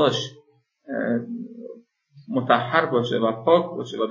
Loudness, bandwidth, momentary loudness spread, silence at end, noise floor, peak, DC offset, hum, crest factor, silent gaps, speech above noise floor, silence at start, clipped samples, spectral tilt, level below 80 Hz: -23 LUFS; 7.4 kHz; 16 LU; 0 s; -55 dBFS; -2 dBFS; under 0.1%; none; 22 dB; none; 33 dB; 0 s; under 0.1%; -5.5 dB/octave; -72 dBFS